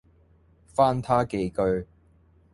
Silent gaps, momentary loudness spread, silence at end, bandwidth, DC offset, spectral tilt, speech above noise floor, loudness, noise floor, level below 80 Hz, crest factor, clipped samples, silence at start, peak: none; 9 LU; 0.7 s; 11.5 kHz; under 0.1%; -7.5 dB/octave; 35 dB; -25 LUFS; -59 dBFS; -50 dBFS; 20 dB; under 0.1%; 0.8 s; -8 dBFS